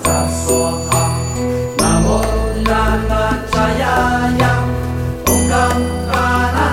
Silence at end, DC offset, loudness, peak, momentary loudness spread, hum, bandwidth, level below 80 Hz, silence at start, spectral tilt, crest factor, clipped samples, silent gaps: 0 s; under 0.1%; -15 LUFS; -2 dBFS; 5 LU; none; 17 kHz; -24 dBFS; 0 s; -4.5 dB/octave; 14 dB; under 0.1%; none